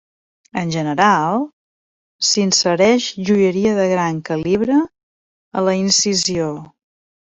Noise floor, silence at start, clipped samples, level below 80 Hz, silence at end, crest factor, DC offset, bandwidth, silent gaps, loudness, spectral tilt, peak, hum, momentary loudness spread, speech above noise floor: under -90 dBFS; 0.55 s; under 0.1%; -56 dBFS; 0.7 s; 16 dB; under 0.1%; 8.4 kHz; 1.53-2.19 s, 5.03-5.51 s; -16 LUFS; -3.5 dB/octave; -2 dBFS; none; 11 LU; over 74 dB